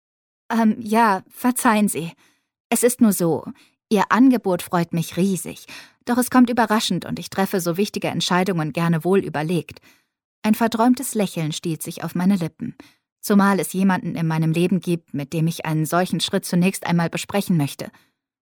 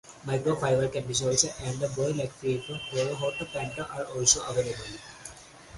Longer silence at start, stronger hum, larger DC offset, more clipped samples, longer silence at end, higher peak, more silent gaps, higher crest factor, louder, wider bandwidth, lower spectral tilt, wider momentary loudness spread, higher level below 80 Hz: first, 0.5 s vs 0.05 s; neither; neither; neither; first, 0.6 s vs 0 s; about the same, -4 dBFS vs -6 dBFS; first, 2.60-2.70 s, 10.24-10.42 s, 13.12-13.16 s vs none; about the same, 18 dB vs 22 dB; first, -20 LUFS vs -28 LUFS; first, 19 kHz vs 11.5 kHz; first, -5.5 dB/octave vs -3.5 dB/octave; second, 11 LU vs 16 LU; second, -64 dBFS vs -54 dBFS